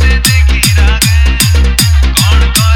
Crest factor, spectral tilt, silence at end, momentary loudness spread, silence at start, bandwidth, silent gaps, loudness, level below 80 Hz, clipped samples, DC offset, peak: 6 dB; -3.5 dB/octave; 0 s; 1 LU; 0 s; 19 kHz; none; -8 LUFS; -10 dBFS; 0.2%; under 0.1%; 0 dBFS